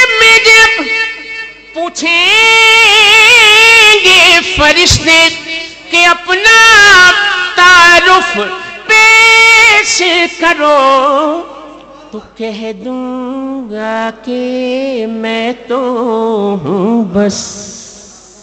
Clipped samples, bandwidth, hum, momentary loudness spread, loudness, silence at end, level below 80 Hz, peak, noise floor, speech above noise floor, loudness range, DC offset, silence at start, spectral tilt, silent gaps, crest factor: 0.5%; 16.5 kHz; none; 18 LU; -5 LUFS; 0.5 s; -36 dBFS; 0 dBFS; -35 dBFS; 24 dB; 14 LU; under 0.1%; 0 s; -1.5 dB/octave; none; 8 dB